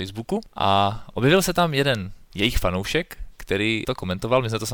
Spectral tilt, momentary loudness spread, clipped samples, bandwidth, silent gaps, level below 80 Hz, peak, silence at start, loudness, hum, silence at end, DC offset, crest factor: -5 dB/octave; 10 LU; under 0.1%; 19.5 kHz; none; -36 dBFS; -6 dBFS; 0 s; -22 LUFS; none; 0 s; under 0.1%; 16 dB